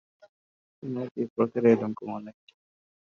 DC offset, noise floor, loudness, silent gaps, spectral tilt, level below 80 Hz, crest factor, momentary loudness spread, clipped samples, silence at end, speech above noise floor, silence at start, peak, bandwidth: under 0.1%; under -90 dBFS; -27 LUFS; 1.11-1.15 s, 1.30-1.36 s; -8 dB/octave; -76 dBFS; 22 dB; 18 LU; under 0.1%; 0.7 s; over 63 dB; 0.85 s; -8 dBFS; 7 kHz